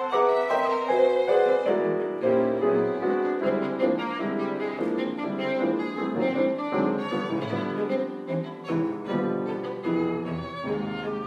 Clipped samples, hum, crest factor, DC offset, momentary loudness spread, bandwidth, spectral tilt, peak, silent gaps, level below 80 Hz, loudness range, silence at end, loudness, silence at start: under 0.1%; none; 16 dB; under 0.1%; 8 LU; 8.4 kHz; -7.5 dB/octave; -10 dBFS; none; -66 dBFS; 5 LU; 0 s; -26 LUFS; 0 s